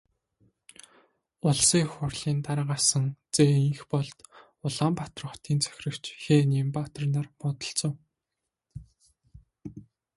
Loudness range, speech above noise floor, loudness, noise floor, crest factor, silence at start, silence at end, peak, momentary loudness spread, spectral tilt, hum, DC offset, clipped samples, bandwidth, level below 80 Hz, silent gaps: 6 LU; 59 dB; -27 LUFS; -86 dBFS; 20 dB; 1.45 s; 0.35 s; -8 dBFS; 23 LU; -4.5 dB/octave; none; under 0.1%; under 0.1%; 11.5 kHz; -60 dBFS; none